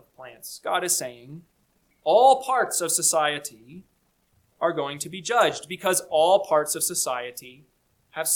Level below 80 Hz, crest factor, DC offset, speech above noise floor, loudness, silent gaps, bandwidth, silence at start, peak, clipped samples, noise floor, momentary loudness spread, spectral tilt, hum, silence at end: -70 dBFS; 20 dB; under 0.1%; 43 dB; -23 LUFS; none; 19 kHz; 0.2 s; -6 dBFS; under 0.1%; -67 dBFS; 19 LU; -1.5 dB/octave; none; 0 s